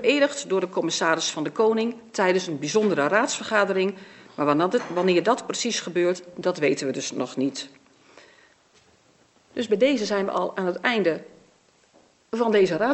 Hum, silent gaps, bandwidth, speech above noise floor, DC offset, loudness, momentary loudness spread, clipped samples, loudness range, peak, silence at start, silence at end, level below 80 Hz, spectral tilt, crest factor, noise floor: none; none; 8.4 kHz; 37 dB; under 0.1%; -24 LUFS; 8 LU; under 0.1%; 6 LU; -4 dBFS; 0 s; 0 s; -76 dBFS; -4 dB/octave; 20 dB; -60 dBFS